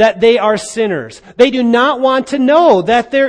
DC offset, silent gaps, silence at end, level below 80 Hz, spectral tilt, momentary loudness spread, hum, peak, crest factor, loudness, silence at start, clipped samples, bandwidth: under 0.1%; none; 0 s; -50 dBFS; -4.5 dB/octave; 8 LU; none; 0 dBFS; 12 dB; -11 LUFS; 0 s; 0.2%; 10 kHz